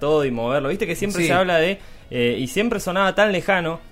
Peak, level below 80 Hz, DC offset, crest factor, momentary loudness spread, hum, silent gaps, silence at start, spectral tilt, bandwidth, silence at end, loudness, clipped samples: -4 dBFS; -42 dBFS; under 0.1%; 16 dB; 6 LU; none; none; 0 s; -5 dB/octave; 16 kHz; 0.05 s; -20 LUFS; under 0.1%